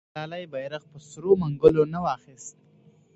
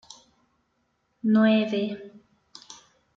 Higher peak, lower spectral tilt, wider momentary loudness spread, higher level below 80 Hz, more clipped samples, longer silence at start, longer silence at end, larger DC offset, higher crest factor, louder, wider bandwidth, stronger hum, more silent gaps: first, -2 dBFS vs -10 dBFS; about the same, -7 dB/octave vs -6.5 dB/octave; about the same, 23 LU vs 25 LU; first, -54 dBFS vs -74 dBFS; neither; second, 0.15 s vs 1.25 s; first, 0.65 s vs 0.45 s; neither; first, 24 dB vs 18 dB; about the same, -24 LUFS vs -23 LUFS; first, 8.2 kHz vs 7.4 kHz; neither; neither